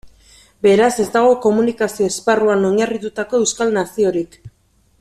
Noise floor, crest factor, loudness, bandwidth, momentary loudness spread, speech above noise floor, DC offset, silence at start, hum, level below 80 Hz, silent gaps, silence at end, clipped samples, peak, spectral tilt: -49 dBFS; 14 dB; -16 LUFS; 14 kHz; 7 LU; 33 dB; under 0.1%; 0.05 s; none; -54 dBFS; none; 0.55 s; under 0.1%; -2 dBFS; -4.5 dB/octave